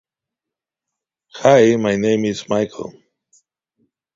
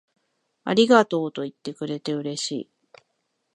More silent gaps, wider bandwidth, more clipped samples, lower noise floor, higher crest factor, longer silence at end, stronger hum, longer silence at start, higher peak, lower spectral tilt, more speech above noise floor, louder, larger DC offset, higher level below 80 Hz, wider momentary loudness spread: neither; second, 7.8 kHz vs 11 kHz; neither; first, -86 dBFS vs -75 dBFS; about the same, 20 dB vs 22 dB; first, 1.25 s vs 0.95 s; neither; first, 1.35 s vs 0.65 s; about the same, 0 dBFS vs -2 dBFS; about the same, -5.5 dB/octave vs -4.5 dB/octave; first, 70 dB vs 52 dB; first, -16 LUFS vs -23 LUFS; neither; first, -58 dBFS vs -74 dBFS; about the same, 16 LU vs 17 LU